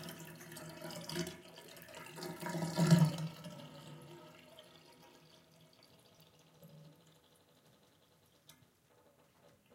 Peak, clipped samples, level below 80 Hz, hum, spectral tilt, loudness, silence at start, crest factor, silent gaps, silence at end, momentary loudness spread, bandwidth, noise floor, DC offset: -14 dBFS; under 0.1%; -76 dBFS; none; -6 dB/octave; -37 LUFS; 0 s; 26 dB; none; 2.8 s; 30 LU; 16.5 kHz; -69 dBFS; under 0.1%